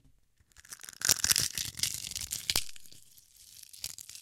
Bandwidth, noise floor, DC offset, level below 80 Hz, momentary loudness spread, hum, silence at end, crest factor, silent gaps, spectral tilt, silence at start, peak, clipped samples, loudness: 17 kHz; -65 dBFS; under 0.1%; -58 dBFS; 21 LU; none; 0 s; 32 dB; none; 0.5 dB/octave; 0.1 s; -4 dBFS; under 0.1%; -30 LUFS